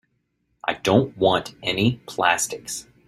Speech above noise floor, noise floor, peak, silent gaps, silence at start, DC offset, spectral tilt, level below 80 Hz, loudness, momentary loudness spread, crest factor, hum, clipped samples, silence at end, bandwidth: 49 dB; -71 dBFS; -2 dBFS; none; 0.65 s; under 0.1%; -4 dB/octave; -54 dBFS; -22 LUFS; 10 LU; 22 dB; none; under 0.1%; 0.25 s; 15.5 kHz